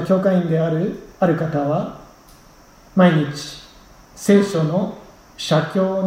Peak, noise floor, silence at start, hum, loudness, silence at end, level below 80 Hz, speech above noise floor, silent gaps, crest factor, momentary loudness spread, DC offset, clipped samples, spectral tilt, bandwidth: -2 dBFS; -47 dBFS; 0 s; none; -19 LUFS; 0 s; -52 dBFS; 29 dB; none; 18 dB; 15 LU; under 0.1%; under 0.1%; -7 dB/octave; 15.5 kHz